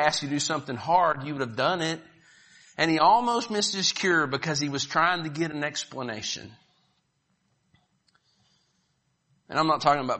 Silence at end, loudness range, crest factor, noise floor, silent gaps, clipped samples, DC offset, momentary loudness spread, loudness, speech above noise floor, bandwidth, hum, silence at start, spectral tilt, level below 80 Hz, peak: 0 s; 14 LU; 22 dB; -73 dBFS; none; under 0.1%; under 0.1%; 11 LU; -25 LUFS; 47 dB; 8.4 kHz; none; 0 s; -3.5 dB/octave; -68 dBFS; -6 dBFS